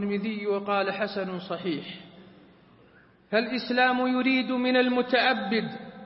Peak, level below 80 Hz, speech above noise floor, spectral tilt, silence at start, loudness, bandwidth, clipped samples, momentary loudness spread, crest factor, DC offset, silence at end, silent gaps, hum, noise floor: -10 dBFS; -72 dBFS; 31 dB; -9 dB/octave; 0 s; -26 LUFS; 5.8 kHz; under 0.1%; 10 LU; 18 dB; under 0.1%; 0 s; none; none; -57 dBFS